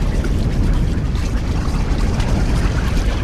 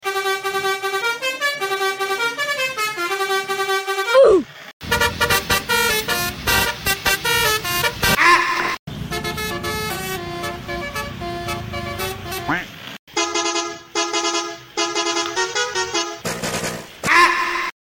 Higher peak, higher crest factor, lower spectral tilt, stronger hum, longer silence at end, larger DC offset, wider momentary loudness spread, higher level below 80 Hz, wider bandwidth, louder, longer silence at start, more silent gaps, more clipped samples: about the same, -4 dBFS vs -4 dBFS; about the same, 12 dB vs 16 dB; first, -6.5 dB/octave vs -2.5 dB/octave; neither; second, 0 s vs 0.15 s; neither; second, 2 LU vs 13 LU; first, -18 dBFS vs -42 dBFS; second, 12.5 kHz vs 17 kHz; about the same, -20 LUFS vs -19 LUFS; about the same, 0 s vs 0 s; second, none vs 4.73-4.80 s, 8.79-8.87 s, 12.99-13.07 s; neither